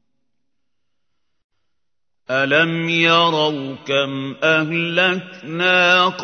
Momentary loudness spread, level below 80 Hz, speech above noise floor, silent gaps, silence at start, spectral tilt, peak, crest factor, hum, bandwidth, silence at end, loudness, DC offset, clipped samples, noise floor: 10 LU; -70 dBFS; 65 dB; none; 2.3 s; -4.5 dB/octave; -2 dBFS; 18 dB; none; 6.6 kHz; 0 s; -16 LUFS; under 0.1%; under 0.1%; -83 dBFS